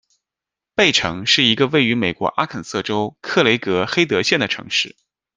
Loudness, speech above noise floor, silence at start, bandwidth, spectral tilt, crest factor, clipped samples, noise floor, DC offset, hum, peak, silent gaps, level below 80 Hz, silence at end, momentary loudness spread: -17 LUFS; 68 dB; 0.8 s; 10 kHz; -3.5 dB/octave; 18 dB; under 0.1%; -87 dBFS; under 0.1%; none; -2 dBFS; none; -56 dBFS; 0.5 s; 9 LU